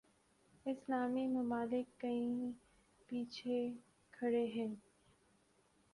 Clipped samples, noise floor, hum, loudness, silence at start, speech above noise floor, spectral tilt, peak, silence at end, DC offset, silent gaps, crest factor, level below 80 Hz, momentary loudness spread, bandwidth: under 0.1%; -74 dBFS; none; -41 LUFS; 0.65 s; 34 dB; -6.5 dB/octave; -26 dBFS; 1.15 s; under 0.1%; none; 16 dB; -80 dBFS; 9 LU; 11 kHz